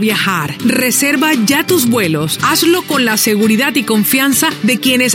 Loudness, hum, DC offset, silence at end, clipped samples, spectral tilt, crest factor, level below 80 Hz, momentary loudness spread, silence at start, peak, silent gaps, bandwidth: -12 LUFS; none; under 0.1%; 0 s; under 0.1%; -3 dB/octave; 12 dB; -56 dBFS; 3 LU; 0 s; 0 dBFS; none; 17 kHz